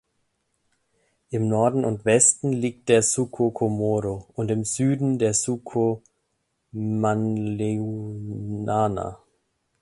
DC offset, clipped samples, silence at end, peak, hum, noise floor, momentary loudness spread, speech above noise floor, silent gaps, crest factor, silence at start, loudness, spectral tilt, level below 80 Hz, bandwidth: under 0.1%; under 0.1%; 0.65 s; -2 dBFS; none; -74 dBFS; 13 LU; 51 dB; none; 22 dB; 1.3 s; -23 LUFS; -5 dB/octave; -56 dBFS; 11.5 kHz